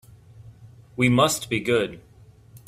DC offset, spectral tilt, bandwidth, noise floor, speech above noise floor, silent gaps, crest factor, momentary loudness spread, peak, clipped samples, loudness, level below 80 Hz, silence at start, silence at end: under 0.1%; -4.5 dB/octave; 16 kHz; -51 dBFS; 29 dB; none; 20 dB; 12 LU; -4 dBFS; under 0.1%; -22 LUFS; -54 dBFS; 0.4 s; 0.1 s